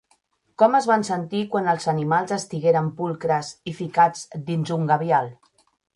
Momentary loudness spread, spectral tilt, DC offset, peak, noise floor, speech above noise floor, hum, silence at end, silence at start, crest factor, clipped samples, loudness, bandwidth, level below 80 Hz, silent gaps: 8 LU; -6 dB/octave; under 0.1%; -4 dBFS; -65 dBFS; 44 dB; none; 0.6 s; 0.6 s; 18 dB; under 0.1%; -22 LUFS; 11.5 kHz; -66 dBFS; none